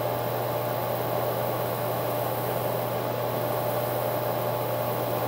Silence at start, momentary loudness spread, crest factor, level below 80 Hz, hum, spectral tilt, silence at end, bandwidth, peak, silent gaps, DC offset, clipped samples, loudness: 0 s; 1 LU; 14 dB; -62 dBFS; none; -5.5 dB/octave; 0 s; 16 kHz; -14 dBFS; none; under 0.1%; under 0.1%; -28 LUFS